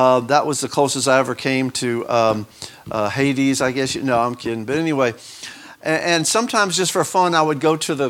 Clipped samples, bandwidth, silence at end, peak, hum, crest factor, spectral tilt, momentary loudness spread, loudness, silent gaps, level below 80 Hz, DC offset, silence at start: under 0.1%; 17 kHz; 0 s; -2 dBFS; none; 18 dB; -4 dB/octave; 10 LU; -19 LUFS; none; -58 dBFS; under 0.1%; 0 s